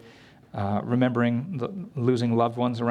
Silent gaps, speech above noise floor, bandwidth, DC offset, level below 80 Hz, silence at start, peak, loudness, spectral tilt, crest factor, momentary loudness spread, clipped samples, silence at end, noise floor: none; 27 dB; 9.4 kHz; under 0.1%; -66 dBFS; 0.05 s; -8 dBFS; -26 LUFS; -8 dB/octave; 16 dB; 9 LU; under 0.1%; 0 s; -51 dBFS